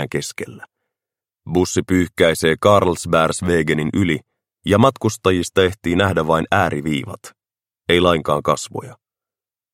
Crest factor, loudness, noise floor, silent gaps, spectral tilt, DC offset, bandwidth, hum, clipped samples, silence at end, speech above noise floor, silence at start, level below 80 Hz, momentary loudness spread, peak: 18 dB; -18 LUFS; under -90 dBFS; none; -5 dB/octave; under 0.1%; 16.5 kHz; none; under 0.1%; 0.8 s; over 73 dB; 0 s; -46 dBFS; 14 LU; 0 dBFS